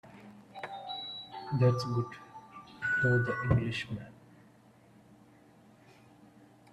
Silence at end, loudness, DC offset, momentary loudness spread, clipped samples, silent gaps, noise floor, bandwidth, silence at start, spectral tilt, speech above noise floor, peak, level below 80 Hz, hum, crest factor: 2.6 s; -32 LUFS; under 0.1%; 22 LU; under 0.1%; none; -60 dBFS; 9.4 kHz; 0.05 s; -7 dB/octave; 30 dB; -12 dBFS; -58 dBFS; none; 22 dB